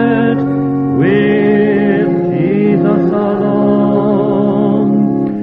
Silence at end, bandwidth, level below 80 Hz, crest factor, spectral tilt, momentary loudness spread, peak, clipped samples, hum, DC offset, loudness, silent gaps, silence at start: 0 s; 4.4 kHz; -50 dBFS; 12 dB; -11 dB/octave; 3 LU; 0 dBFS; under 0.1%; none; under 0.1%; -12 LUFS; none; 0 s